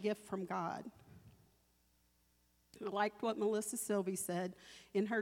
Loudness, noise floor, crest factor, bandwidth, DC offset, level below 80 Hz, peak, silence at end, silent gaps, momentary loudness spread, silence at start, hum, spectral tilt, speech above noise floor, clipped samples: -40 LUFS; -75 dBFS; 18 dB; 17 kHz; under 0.1%; -78 dBFS; -22 dBFS; 0 s; none; 11 LU; 0 s; none; -4.5 dB/octave; 36 dB; under 0.1%